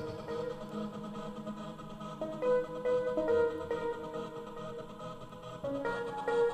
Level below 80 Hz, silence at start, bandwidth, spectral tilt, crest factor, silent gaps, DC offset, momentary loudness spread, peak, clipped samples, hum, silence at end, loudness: -60 dBFS; 0 s; 9.6 kHz; -6.5 dB/octave; 16 dB; none; under 0.1%; 14 LU; -20 dBFS; under 0.1%; none; 0 s; -36 LUFS